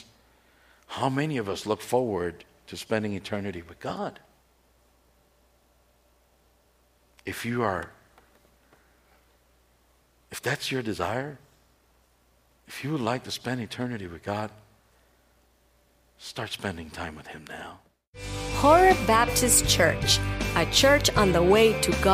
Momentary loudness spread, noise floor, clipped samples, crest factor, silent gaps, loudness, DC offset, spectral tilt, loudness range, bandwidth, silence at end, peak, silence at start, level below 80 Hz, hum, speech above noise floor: 21 LU; -64 dBFS; under 0.1%; 20 dB; 18.07-18.13 s; -25 LUFS; under 0.1%; -3.5 dB/octave; 18 LU; 15.5 kHz; 0 s; -6 dBFS; 0.9 s; -44 dBFS; none; 39 dB